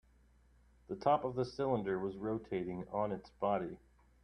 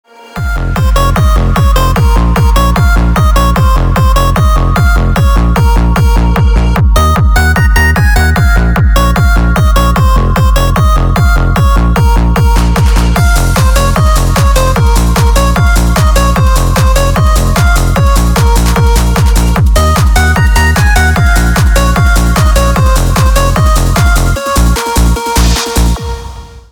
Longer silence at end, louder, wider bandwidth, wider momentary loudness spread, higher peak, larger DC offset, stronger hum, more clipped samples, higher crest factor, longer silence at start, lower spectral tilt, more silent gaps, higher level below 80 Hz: first, 0.45 s vs 0.1 s; second, -37 LUFS vs -9 LUFS; second, 9.6 kHz vs over 20 kHz; first, 7 LU vs 2 LU; second, -16 dBFS vs 0 dBFS; second, under 0.1% vs 0.2%; neither; neither; first, 22 dB vs 6 dB; first, 0.9 s vs 0.35 s; first, -8 dB/octave vs -5.5 dB/octave; neither; second, -66 dBFS vs -8 dBFS